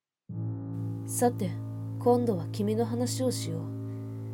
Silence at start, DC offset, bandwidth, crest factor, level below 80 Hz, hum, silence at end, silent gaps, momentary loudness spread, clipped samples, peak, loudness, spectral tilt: 0.3 s; under 0.1%; 17.5 kHz; 18 dB; -66 dBFS; none; 0 s; none; 11 LU; under 0.1%; -12 dBFS; -31 LUFS; -6 dB/octave